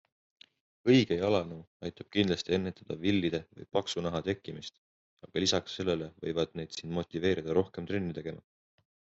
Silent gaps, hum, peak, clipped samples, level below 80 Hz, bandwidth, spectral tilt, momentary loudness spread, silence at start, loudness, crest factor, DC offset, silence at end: 1.67-1.80 s, 4.78-5.17 s; none; -12 dBFS; under 0.1%; -66 dBFS; 8 kHz; -4.5 dB/octave; 14 LU; 0.85 s; -32 LUFS; 22 dB; under 0.1%; 0.8 s